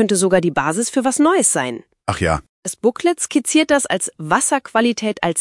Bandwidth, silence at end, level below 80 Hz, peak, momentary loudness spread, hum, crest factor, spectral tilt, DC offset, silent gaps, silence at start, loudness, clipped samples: 12 kHz; 0 s; -46 dBFS; 0 dBFS; 7 LU; none; 18 dB; -3.5 dB/octave; under 0.1%; 2.49-2.63 s; 0 s; -17 LUFS; under 0.1%